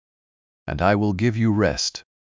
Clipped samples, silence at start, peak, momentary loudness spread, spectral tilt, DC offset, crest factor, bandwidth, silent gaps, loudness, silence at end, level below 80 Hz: under 0.1%; 0.65 s; -6 dBFS; 10 LU; -5.5 dB/octave; under 0.1%; 16 dB; 7.6 kHz; none; -21 LUFS; 0.2 s; -40 dBFS